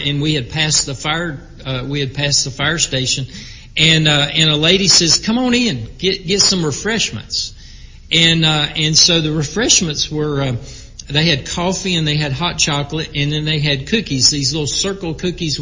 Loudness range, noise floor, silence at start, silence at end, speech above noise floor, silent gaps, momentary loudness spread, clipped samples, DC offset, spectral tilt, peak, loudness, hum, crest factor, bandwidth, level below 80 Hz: 4 LU; -36 dBFS; 0 s; 0 s; 20 dB; none; 11 LU; under 0.1%; under 0.1%; -3 dB/octave; 0 dBFS; -14 LUFS; none; 16 dB; 7.8 kHz; -36 dBFS